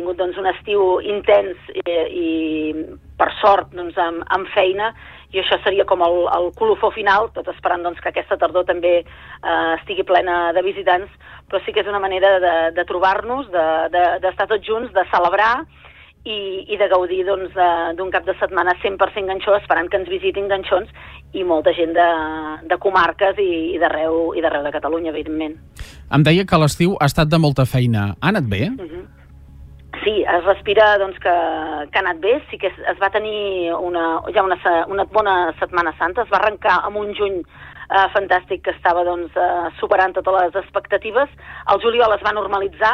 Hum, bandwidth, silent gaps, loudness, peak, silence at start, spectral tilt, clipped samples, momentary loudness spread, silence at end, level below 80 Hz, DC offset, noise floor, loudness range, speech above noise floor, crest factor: none; 15 kHz; none; -18 LUFS; -2 dBFS; 0 s; -6 dB/octave; under 0.1%; 9 LU; 0 s; -44 dBFS; under 0.1%; -40 dBFS; 2 LU; 23 dB; 16 dB